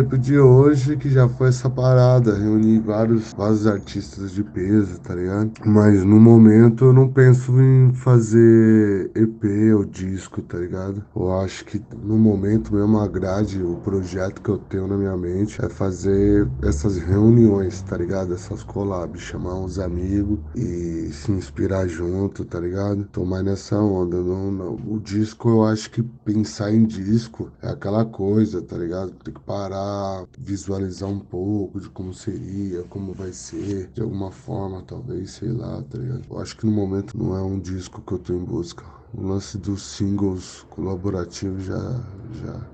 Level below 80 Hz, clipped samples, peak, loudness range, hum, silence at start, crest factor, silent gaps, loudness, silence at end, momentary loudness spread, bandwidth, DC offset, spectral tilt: -40 dBFS; under 0.1%; 0 dBFS; 14 LU; none; 0 s; 18 dB; none; -20 LUFS; 0.05 s; 17 LU; 8.4 kHz; under 0.1%; -8.5 dB/octave